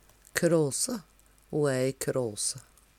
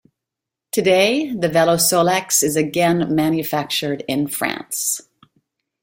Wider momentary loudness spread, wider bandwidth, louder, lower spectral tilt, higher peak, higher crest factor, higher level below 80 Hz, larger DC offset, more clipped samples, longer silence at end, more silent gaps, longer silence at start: about the same, 10 LU vs 8 LU; about the same, 16.5 kHz vs 16.5 kHz; second, -29 LUFS vs -18 LUFS; about the same, -4 dB/octave vs -3.5 dB/octave; second, -8 dBFS vs -2 dBFS; about the same, 22 dB vs 18 dB; about the same, -62 dBFS vs -58 dBFS; neither; neither; second, 0.35 s vs 0.8 s; neither; second, 0.35 s vs 0.75 s